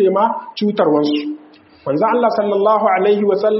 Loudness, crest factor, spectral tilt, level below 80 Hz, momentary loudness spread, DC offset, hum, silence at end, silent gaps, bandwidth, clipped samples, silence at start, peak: -16 LUFS; 14 dB; -4.5 dB/octave; -66 dBFS; 8 LU; under 0.1%; none; 0 s; none; 6 kHz; under 0.1%; 0 s; -2 dBFS